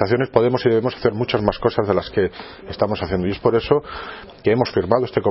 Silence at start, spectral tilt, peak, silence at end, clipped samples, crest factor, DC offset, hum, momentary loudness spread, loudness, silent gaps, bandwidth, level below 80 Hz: 0 s; -10 dB/octave; 0 dBFS; 0 s; under 0.1%; 20 dB; under 0.1%; none; 8 LU; -20 LUFS; none; 5.8 kHz; -44 dBFS